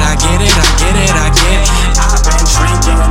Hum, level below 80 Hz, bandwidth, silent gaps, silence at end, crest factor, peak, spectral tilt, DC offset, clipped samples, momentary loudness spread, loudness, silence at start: none; -10 dBFS; 15.5 kHz; none; 0 s; 8 dB; 0 dBFS; -3.5 dB/octave; under 0.1%; under 0.1%; 2 LU; -10 LUFS; 0 s